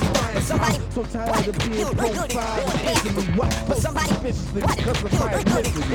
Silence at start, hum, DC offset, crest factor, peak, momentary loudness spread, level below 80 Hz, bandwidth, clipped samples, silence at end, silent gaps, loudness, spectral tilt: 0 s; none; under 0.1%; 16 dB; -6 dBFS; 3 LU; -32 dBFS; over 20 kHz; under 0.1%; 0 s; none; -23 LUFS; -5 dB/octave